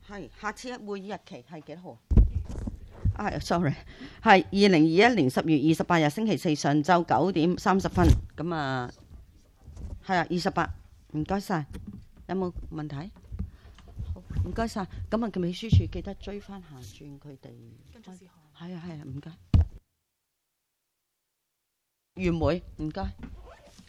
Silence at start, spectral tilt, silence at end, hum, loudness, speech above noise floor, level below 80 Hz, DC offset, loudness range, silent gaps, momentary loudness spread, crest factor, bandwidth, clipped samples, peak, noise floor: 0.1 s; -6.5 dB/octave; 0.35 s; none; -26 LUFS; 54 dB; -36 dBFS; under 0.1%; 12 LU; none; 22 LU; 24 dB; 14 kHz; under 0.1%; -4 dBFS; -81 dBFS